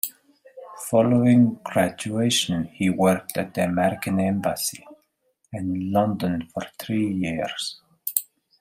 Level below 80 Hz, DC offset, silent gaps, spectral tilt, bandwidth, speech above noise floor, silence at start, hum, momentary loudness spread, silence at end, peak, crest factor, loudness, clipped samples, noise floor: -62 dBFS; under 0.1%; none; -5 dB/octave; 16 kHz; 47 dB; 0.05 s; none; 13 LU; 0.4 s; 0 dBFS; 24 dB; -23 LUFS; under 0.1%; -69 dBFS